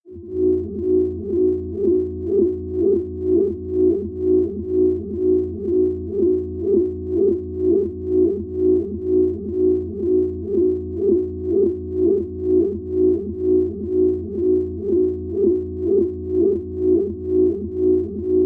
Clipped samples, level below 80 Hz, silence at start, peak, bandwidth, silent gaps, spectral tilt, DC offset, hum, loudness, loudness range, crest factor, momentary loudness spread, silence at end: under 0.1%; -46 dBFS; 0.05 s; -6 dBFS; 1.3 kHz; none; -13 dB/octave; under 0.1%; none; -20 LUFS; 1 LU; 12 dB; 3 LU; 0 s